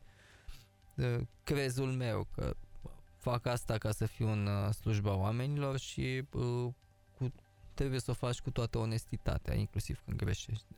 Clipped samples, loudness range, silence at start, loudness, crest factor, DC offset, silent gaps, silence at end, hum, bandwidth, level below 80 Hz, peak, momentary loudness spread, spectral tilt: under 0.1%; 3 LU; 0 s; -37 LUFS; 16 dB; under 0.1%; none; 0.15 s; none; 16.5 kHz; -48 dBFS; -20 dBFS; 9 LU; -6.5 dB/octave